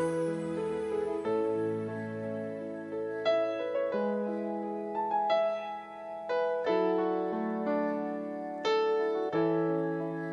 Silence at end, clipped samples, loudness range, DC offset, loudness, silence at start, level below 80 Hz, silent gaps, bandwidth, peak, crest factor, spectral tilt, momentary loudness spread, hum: 0 s; under 0.1%; 3 LU; under 0.1%; -32 LUFS; 0 s; -72 dBFS; none; 11.5 kHz; -18 dBFS; 14 dB; -7 dB/octave; 8 LU; none